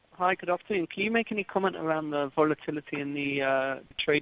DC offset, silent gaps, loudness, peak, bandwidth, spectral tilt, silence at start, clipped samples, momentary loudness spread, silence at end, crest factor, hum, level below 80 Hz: under 0.1%; none; -29 LUFS; -10 dBFS; 4 kHz; -3 dB/octave; 0.2 s; under 0.1%; 6 LU; 0 s; 20 dB; none; -66 dBFS